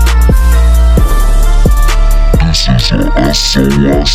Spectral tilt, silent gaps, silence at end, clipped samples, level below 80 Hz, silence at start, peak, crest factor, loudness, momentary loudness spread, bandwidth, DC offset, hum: -5 dB/octave; none; 0 s; under 0.1%; -8 dBFS; 0 s; 0 dBFS; 6 dB; -10 LUFS; 3 LU; 15.5 kHz; under 0.1%; none